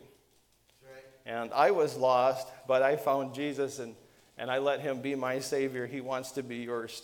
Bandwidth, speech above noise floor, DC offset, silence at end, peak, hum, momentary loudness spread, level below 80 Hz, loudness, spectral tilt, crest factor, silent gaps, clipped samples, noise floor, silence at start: 18 kHz; 37 dB; under 0.1%; 0 s; -10 dBFS; none; 12 LU; -76 dBFS; -31 LUFS; -4.5 dB/octave; 20 dB; none; under 0.1%; -67 dBFS; 0.85 s